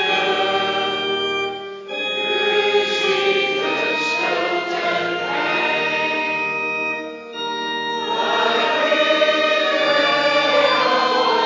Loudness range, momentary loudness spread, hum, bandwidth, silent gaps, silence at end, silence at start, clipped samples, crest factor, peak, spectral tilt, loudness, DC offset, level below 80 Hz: 4 LU; 7 LU; none; 7.6 kHz; none; 0 s; 0 s; under 0.1%; 16 dB; -4 dBFS; -3 dB/octave; -18 LUFS; under 0.1%; -64 dBFS